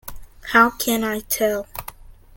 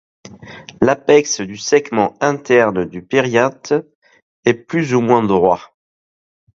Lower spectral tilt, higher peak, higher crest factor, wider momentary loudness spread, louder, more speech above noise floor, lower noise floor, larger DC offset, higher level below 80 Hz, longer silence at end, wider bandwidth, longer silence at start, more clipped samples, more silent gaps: second, -2.5 dB/octave vs -5 dB/octave; about the same, -2 dBFS vs 0 dBFS; first, 22 dB vs 16 dB; first, 22 LU vs 8 LU; second, -19 LUFS vs -16 LUFS; about the same, 21 dB vs 22 dB; first, -41 dBFS vs -37 dBFS; neither; first, -44 dBFS vs -52 dBFS; second, 0.25 s vs 0.9 s; first, 17 kHz vs 7.6 kHz; second, 0.05 s vs 0.25 s; neither; second, none vs 3.95-4.02 s, 4.22-4.43 s